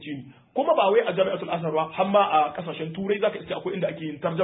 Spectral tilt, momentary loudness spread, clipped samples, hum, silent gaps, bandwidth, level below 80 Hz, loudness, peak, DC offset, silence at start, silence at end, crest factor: -10.5 dB/octave; 12 LU; under 0.1%; none; none; 4 kHz; -66 dBFS; -24 LUFS; -8 dBFS; under 0.1%; 0 s; 0 s; 18 dB